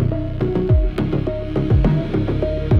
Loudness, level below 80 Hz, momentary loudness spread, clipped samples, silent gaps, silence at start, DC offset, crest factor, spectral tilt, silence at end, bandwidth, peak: -20 LUFS; -24 dBFS; 6 LU; under 0.1%; none; 0 s; under 0.1%; 12 dB; -10 dB/octave; 0 s; 5.8 kHz; -6 dBFS